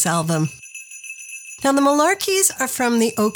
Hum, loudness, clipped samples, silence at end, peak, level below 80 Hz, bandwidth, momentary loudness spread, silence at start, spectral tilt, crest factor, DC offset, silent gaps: none; -18 LUFS; under 0.1%; 0 s; -2 dBFS; -62 dBFS; 19.5 kHz; 17 LU; 0 s; -3.5 dB/octave; 18 dB; under 0.1%; none